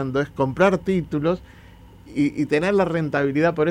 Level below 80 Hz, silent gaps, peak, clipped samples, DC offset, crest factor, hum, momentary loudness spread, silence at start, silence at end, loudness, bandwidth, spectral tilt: -48 dBFS; none; -6 dBFS; under 0.1%; under 0.1%; 16 dB; none; 6 LU; 0 s; 0 s; -22 LUFS; 11 kHz; -7.5 dB/octave